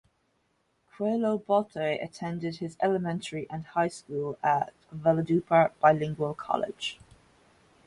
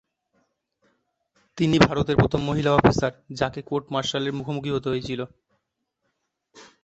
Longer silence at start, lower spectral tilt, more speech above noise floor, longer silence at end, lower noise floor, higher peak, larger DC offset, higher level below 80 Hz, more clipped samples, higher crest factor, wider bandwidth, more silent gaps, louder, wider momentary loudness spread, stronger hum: second, 1 s vs 1.55 s; about the same, -6.5 dB/octave vs -6 dB/octave; second, 45 dB vs 55 dB; first, 0.9 s vs 0.2 s; second, -73 dBFS vs -77 dBFS; second, -8 dBFS vs -2 dBFS; neither; second, -66 dBFS vs -46 dBFS; neither; about the same, 22 dB vs 24 dB; first, 11.5 kHz vs 8.2 kHz; neither; second, -28 LUFS vs -23 LUFS; about the same, 11 LU vs 11 LU; neither